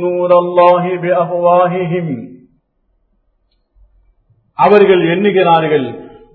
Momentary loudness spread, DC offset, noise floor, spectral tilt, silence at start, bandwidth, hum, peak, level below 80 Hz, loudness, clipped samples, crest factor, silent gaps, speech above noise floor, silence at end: 14 LU; under 0.1%; -61 dBFS; -9.5 dB/octave; 0 s; 4.6 kHz; none; 0 dBFS; -56 dBFS; -11 LUFS; under 0.1%; 14 dB; none; 51 dB; 0.25 s